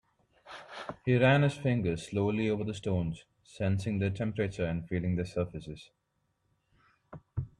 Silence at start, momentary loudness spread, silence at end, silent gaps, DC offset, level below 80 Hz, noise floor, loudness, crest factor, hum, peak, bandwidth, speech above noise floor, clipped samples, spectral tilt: 0.45 s; 19 LU; 0.15 s; none; under 0.1%; -58 dBFS; -77 dBFS; -31 LUFS; 20 dB; none; -12 dBFS; 11 kHz; 47 dB; under 0.1%; -7.5 dB/octave